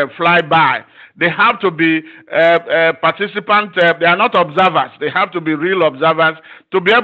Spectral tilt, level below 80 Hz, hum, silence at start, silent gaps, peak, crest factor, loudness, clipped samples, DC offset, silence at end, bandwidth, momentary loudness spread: -7 dB/octave; -62 dBFS; none; 0 s; none; 0 dBFS; 14 dB; -13 LUFS; under 0.1%; under 0.1%; 0 s; 7.6 kHz; 7 LU